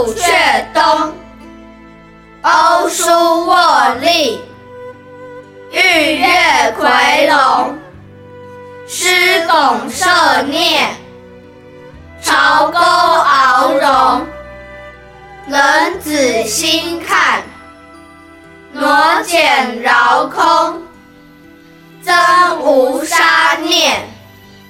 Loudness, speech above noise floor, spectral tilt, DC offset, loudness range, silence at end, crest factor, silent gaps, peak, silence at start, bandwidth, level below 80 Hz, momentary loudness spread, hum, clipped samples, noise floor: -11 LUFS; 29 dB; -1.5 dB/octave; under 0.1%; 3 LU; 0.55 s; 12 dB; none; 0 dBFS; 0 s; 17 kHz; -48 dBFS; 12 LU; none; under 0.1%; -40 dBFS